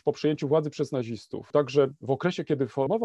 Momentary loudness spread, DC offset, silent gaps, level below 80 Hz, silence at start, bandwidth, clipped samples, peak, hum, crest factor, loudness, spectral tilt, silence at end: 7 LU; under 0.1%; none; -66 dBFS; 0.05 s; 8.6 kHz; under 0.1%; -8 dBFS; none; 18 dB; -27 LUFS; -7 dB/octave; 0 s